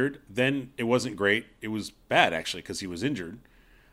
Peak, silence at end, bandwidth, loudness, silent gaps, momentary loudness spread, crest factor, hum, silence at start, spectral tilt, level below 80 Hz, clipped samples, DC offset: -4 dBFS; 0.55 s; 16 kHz; -28 LUFS; none; 12 LU; 24 dB; none; 0 s; -4.5 dB/octave; -60 dBFS; under 0.1%; under 0.1%